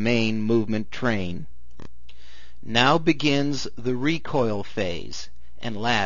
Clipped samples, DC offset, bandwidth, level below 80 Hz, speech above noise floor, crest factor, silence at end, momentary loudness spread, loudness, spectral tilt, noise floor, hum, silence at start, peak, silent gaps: under 0.1%; 4%; 7.4 kHz; -50 dBFS; 27 dB; 24 dB; 0 s; 17 LU; -24 LUFS; -5 dB/octave; -51 dBFS; none; 0 s; -2 dBFS; none